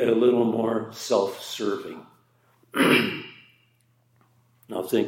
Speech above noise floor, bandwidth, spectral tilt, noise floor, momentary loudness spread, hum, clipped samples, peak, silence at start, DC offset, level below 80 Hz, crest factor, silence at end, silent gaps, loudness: 41 dB; 16.5 kHz; -4.5 dB/octave; -65 dBFS; 16 LU; none; under 0.1%; -6 dBFS; 0 s; under 0.1%; -78 dBFS; 18 dB; 0 s; none; -24 LUFS